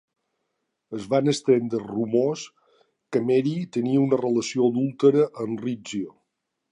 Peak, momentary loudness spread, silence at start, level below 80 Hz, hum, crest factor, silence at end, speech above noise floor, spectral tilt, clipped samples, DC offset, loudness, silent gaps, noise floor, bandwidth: -6 dBFS; 12 LU; 0.9 s; -70 dBFS; none; 18 dB; 0.6 s; 56 dB; -6.5 dB/octave; under 0.1%; under 0.1%; -24 LUFS; none; -79 dBFS; 11 kHz